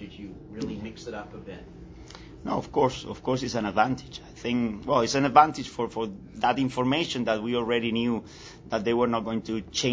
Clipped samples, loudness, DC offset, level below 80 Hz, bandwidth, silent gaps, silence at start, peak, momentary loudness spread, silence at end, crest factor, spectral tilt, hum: under 0.1%; -27 LUFS; under 0.1%; -52 dBFS; 8 kHz; none; 0 s; -2 dBFS; 18 LU; 0 s; 24 dB; -5 dB/octave; none